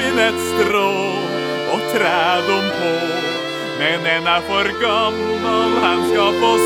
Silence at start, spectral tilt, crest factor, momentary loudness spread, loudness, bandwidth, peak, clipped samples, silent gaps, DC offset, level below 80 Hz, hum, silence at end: 0 s; -4 dB/octave; 16 dB; 5 LU; -17 LUFS; 17.5 kHz; 0 dBFS; under 0.1%; none; under 0.1%; -52 dBFS; none; 0 s